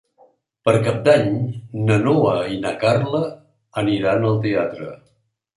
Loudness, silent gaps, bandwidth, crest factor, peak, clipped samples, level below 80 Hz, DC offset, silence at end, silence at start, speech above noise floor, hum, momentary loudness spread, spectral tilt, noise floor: -19 LUFS; none; 11.5 kHz; 18 dB; -2 dBFS; under 0.1%; -54 dBFS; under 0.1%; 0.6 s; 0.65 s; 47 dB; none; 11 LU; -7 dB/octave; -65 dBFS